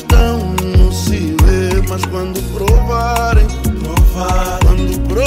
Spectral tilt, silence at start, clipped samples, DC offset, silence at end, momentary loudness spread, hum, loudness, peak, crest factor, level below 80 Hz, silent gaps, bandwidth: -6 dB/octave; 0 s; under 0.1%; under 0.1%; 0 s; 6 LU; none; -14 LUFS; 0 dBFS; 10 dB; -14 dBFS; none; 16.5 kHz